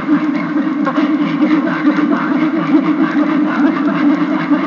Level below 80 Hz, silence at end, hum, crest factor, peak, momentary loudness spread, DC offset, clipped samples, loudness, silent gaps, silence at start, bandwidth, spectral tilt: -64 dBFS; 0 s; none; 12 dB; -2 dBFS; 2 LU; under 0.1%; under 0.1%; -14 LUFS; none; 0 s; 6.8 kHz; -7.5 dB/octave